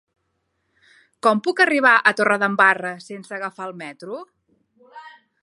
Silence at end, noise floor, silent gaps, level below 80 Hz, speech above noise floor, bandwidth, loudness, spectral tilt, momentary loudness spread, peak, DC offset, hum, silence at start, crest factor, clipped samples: 0.35 s; -72 dBFS; none; -78 dBFS; 53 dB; 11.5 kHz; -18 LUFS; -4.5 dB/octave; 20 LU; -2 dBFS; under 0.1%; none; 1.25 s; 20 dB; under 0.1%